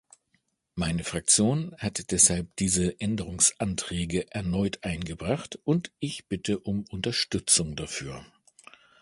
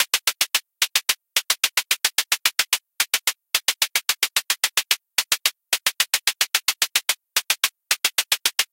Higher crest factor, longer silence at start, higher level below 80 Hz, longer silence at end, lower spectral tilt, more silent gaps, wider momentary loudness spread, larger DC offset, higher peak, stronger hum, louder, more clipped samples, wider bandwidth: about the same, 24 dB vs 22 dB; first, 0.75 s vs 0 s; first, -48 dBFS vs -76 dBFS; first, 0.8 s vs 0.1 s; first, -3.5 dB/octave vs 4 dB/octave; neither; first, 12 LU vs 2 LU; neither; second, -6 dBFS vs 0 dBFS; neither; second, -26 LUFS vs -20 LUFS; neither; second, 11.5 kHz vs 17.5 kHz